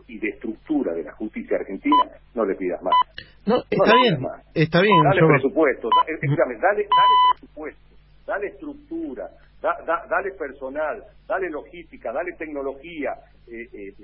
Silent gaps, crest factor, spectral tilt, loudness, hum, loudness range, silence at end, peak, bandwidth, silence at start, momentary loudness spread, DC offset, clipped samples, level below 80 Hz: none; 20 dB; -10.5 dB/octave; -21 LUFS; none; 11 LU; 0 s; -2 dBFS; 5.8 kHz; 0.1 s; 21 LU; under 0.1%; under 0.1%; -52 dBFS